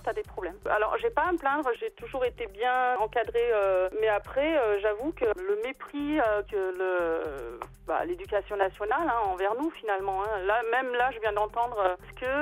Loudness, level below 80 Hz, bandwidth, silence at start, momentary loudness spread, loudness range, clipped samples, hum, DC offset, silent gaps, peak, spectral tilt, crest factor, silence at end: -29 LUFS; -52 dBFS; 15.5 kHz; 0 s; 8 LU; 3 LU; under 0.1%; none; under 0.1%; none; -12 dBFS; -5.5 dB/octave; 16 dB; 0 s